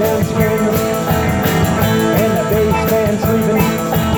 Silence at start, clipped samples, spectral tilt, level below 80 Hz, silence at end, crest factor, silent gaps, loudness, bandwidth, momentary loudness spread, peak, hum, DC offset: 0 s; under 0.1%; -6 dB/octave; -34 dBFS; 0 s; 12 dB; none; -14 LUFS; over 20 kHz; 2 LU; -2 dBFS; none; under 0.1%